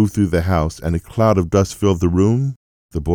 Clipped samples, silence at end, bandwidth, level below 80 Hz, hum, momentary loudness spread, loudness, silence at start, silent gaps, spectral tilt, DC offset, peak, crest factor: under 0.1%; 0 s; 18.5 kHz; -36 dBFS; none; 8 LU; -18 LUFS; 0 s; 2.56-2.89 s; -7.5 dB/octave; under 0.1%; -4 dBFS; 14 dB